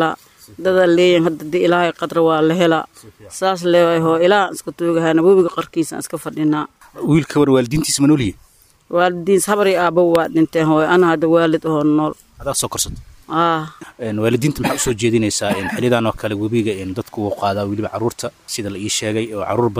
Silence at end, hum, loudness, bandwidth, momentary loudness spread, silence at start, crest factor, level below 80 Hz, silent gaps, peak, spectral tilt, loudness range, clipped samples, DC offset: 0 s; none; -17 LUFS; 16 kHz; 10 LU; 0 s; 16 dB; -46 dBFS; none; 0 dBFS; -5 dB/octave; 4 LU; under 0.1%; under 0.1%